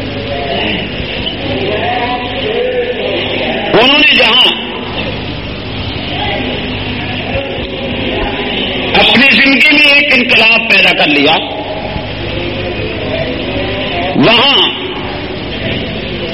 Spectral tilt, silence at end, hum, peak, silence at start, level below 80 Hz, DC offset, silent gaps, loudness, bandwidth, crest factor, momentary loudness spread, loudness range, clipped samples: -5.5 dB/octave; 0 s; 50 Hz at -30 dBFS; 0 dBFS; 0 s; -32 dBFS; 1%; none; -10 LUFS; 17 kHz; 12 dB; 14 LU; 10 LU; 0.2%